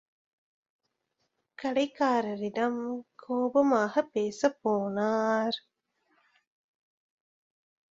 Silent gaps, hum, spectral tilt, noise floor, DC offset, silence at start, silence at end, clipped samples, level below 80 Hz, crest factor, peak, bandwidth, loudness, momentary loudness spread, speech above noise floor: none; none; -5 dB/octave; -80 dBFS; under 0.1%; 1.6 s; 2.3 s; under 0.1%; -76 dBFS; 20 dB; -12 dBFS; 7.8 kHz; -29 LUFS; 10 LU; 52 dB